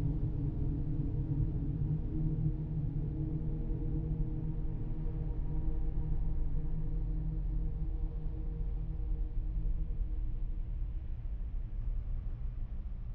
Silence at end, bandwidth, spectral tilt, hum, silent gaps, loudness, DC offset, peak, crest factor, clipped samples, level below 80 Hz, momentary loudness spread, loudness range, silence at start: 0 s; 2.5 kHz; -12 dB/octave; none; none; -39 LUFS; under 0.1%; -20 dBFS; 14 dB; under 0.1%; -36 dBFS; 7 LU; 5 LU; 0 s